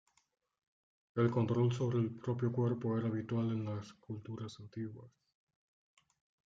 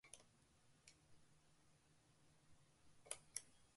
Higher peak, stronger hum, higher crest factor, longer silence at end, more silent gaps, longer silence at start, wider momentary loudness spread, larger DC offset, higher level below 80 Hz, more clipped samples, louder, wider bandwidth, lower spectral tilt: first, -20 dBFS vs -28 dBFS; neither; second, 18 dB vs 36 dB; first, 1.4 s vs 0 s; neither; first, 1.15 s vs 0.05 s; second, 14 LU vs 18 LU; neither; first, -76 dBFS vs -86 dBFS; neither; first, -37 LUFS vs -55 LUFS; second, 7.6 kHz vs 11.5 kHz; first, -8.5 dB/octave vs -1 dB/octave